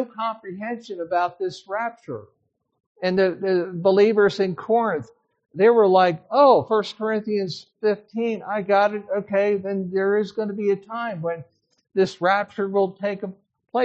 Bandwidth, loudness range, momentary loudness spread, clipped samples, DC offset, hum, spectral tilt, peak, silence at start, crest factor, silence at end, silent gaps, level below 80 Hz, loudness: 7.8 kHz; 6 LU; 14 LU; under 0.1%; under 0.1%; none; -4.5 dB/octave; -4 dBFS; 0 s; 18 dB; 0 s; 2.86-2.95 s; -70 dBFS; -22 LUFS